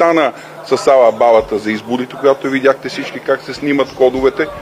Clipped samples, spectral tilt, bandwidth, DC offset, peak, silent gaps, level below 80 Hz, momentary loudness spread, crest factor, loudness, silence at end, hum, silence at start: under 0.1%; -5 dB/octave; 15 kHz; under 0.1%; 0 dBFS; none; -46 dBFS; 10 LU; 14 dB; -14 LUFS; 0 s; none; 0 s